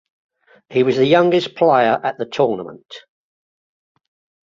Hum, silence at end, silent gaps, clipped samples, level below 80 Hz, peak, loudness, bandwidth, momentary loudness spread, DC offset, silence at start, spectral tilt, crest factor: none; 1.5 s; none; under 0.1%; -62 dBFS; -2 dBFS; -16 LUFS; 7.4 kHz; 13 LU; under 0.1%; 0.7 s; -6.5 dB/octave; 18 dB